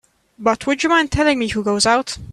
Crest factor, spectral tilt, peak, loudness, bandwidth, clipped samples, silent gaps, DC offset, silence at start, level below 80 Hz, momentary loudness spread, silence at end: 16 dB; -3.5 dB/octave; -2 dBFS; -17 LUFS; 12.5 kHz; under 0.1%; none; under 0.1%; 0.4 s; -38 dBFS; 5 LU; 0 s